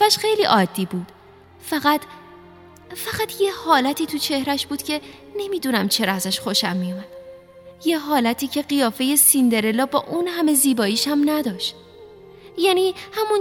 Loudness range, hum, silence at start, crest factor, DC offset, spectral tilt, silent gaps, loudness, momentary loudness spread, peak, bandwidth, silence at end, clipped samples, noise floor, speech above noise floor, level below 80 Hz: 5 LU; none; 0 s; 20 dB; under 0.1%; -3 dB/octave; none; -20 LUFS; 12 LU; -2 dBFS; 17.5 kHz; 0 s; under 0.1%; -46 dBFS; 26 dB; -62 dBFS